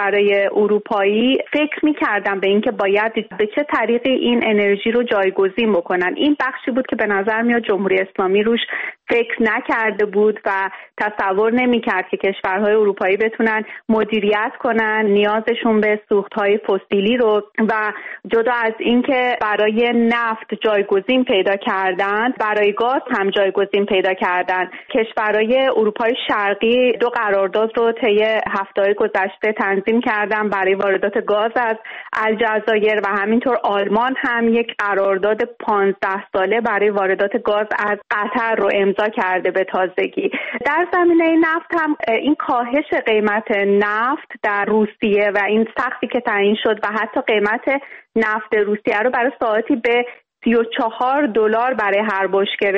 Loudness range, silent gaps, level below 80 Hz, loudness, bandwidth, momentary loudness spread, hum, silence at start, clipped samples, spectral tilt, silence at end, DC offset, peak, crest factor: 1 LU; none; -58 dBFS; -17 LUFS; 6 kHz; 5 LU; none; 0 s; under 0.1%; -7 dB/octave; 0 s; under 0.1%; -6 dBFS; 12 dB